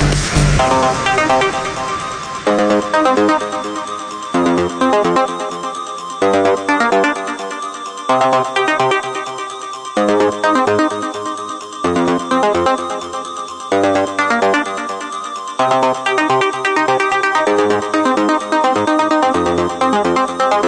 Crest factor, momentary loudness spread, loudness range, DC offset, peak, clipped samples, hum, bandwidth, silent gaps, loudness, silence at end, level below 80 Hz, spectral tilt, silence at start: 14 dB; 10 LU; 3 LU; under 0.1%; 0 dBFS; under 0.1%; none; 10 kHz; none; -15 LUFS; 0 s; -34 dBFS; -4.5 dB/octave; 0 s